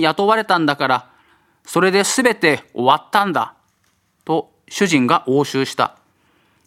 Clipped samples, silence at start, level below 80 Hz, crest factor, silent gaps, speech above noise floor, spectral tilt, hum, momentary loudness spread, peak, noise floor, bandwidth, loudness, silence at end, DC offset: under 0.1%; 0 s; -66 dBFS; 18 dB; none; 46 dB; -4 dB/octave; none; 8 LU; 0 dBFS; -63 dBFS; 16 kHz; -17 LUFS; 0.75 s; under 0.1%